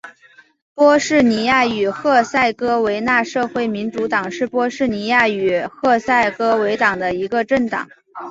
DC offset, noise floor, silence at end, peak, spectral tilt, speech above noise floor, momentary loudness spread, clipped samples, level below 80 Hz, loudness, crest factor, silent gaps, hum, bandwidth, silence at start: under 0.1%; -50 dBFS; 0 s; -2 dBFS; -4.5 dB/octave; 33 dB; 7 LU; under 0.1%; -54 dBFS; -17 LUFS; 16 dB; 0.62-0.76 s; none; 7.8 kHz; 0.05 s